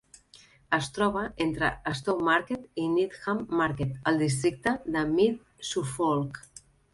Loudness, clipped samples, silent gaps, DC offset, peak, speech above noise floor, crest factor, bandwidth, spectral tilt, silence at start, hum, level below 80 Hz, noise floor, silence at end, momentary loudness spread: -28 LUFS; under 0.1%; none; under 0.1%; -8 dBFS; 29 dB; 20 dB; 11.5 kHz; -5.5 dB/octave; 0.7 s; none; -54 dBFS; -57 dBFS; 0.55 s; 7 LU